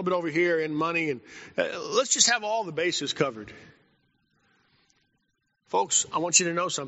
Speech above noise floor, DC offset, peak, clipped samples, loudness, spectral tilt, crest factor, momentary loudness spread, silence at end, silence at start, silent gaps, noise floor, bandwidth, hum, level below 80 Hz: 49 dB; under 0.1%; -4 dBFS; under 0.1%; -25 LUFS; -2 dB/octave; 24 dB; 11 LU; 0 s; 0 s; none; -75 dBFS; 8 kHz; none; -72 dBFS